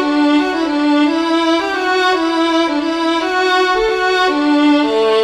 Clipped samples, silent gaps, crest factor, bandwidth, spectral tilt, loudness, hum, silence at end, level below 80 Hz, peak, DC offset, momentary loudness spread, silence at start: under 0.1%; none; 10 dB; 11 kHz; -3 dB/octave; -14 LUFS; none; 0 s; -46 dBFS; -2 dBFS; under 0.1%; 3 LU; 0 s